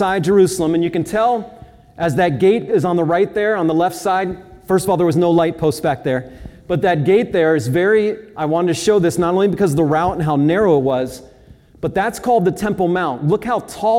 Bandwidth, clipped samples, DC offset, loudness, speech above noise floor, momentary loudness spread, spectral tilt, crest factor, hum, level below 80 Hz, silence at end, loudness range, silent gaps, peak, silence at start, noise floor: 16.5 kHz; under 0.1%; under 0.1%; -17 LUFS; 29 dB; 8 LU; -6.5 dB/octave; 14 dB; none; -46 dBFS; 0 s; 2 LU; none; -2 dBFS; 0 s; -45 dBFS